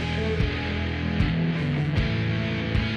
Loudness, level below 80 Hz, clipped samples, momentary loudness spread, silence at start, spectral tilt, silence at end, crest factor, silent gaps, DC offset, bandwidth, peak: -26 LUFS; -34 dBFS; under 0.1%; 3 LU; 0 s; -7.5 dB/octave; 0 s; 14 dB; none; under 0.1%; 8.4 kHz; -10 dBFS